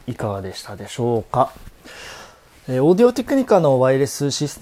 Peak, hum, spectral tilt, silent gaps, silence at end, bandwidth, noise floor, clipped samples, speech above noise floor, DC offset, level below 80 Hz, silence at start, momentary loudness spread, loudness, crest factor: 0 dBFS; none; -6 dB/octave; none; 0.05 s; 16 kHz; -44 dBFS; under 0.1%; 26 dB; under 0.1%; -50 dBFS; 0.05 s; 21 LU; -18 LUFS; 18 dB